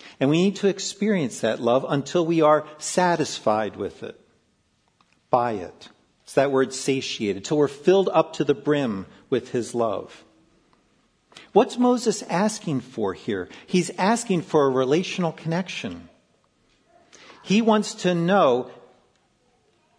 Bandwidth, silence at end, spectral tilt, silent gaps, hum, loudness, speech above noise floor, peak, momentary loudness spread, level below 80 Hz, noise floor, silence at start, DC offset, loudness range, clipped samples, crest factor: 11 kHz; 1.25 s; -5 dB/octave; none; none; -23 LUFS; 44 dB; -4 dBFS; 11 LU; -68 dBFS; -67 dBFS; 0 s; under 0.1%; 4 LU; under 0.1%; 20 dB